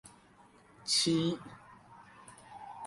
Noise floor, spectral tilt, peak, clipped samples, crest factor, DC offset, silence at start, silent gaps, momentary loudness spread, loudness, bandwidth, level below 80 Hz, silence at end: -61 dBFS; -3.5 dB/octave; -16 dBFS; under 0.1%; 20 dB; under 0.1%; 0.05 s; none; 26 LU; -31 LUFS; 11.5 kHz; -70 dBFS; 0 s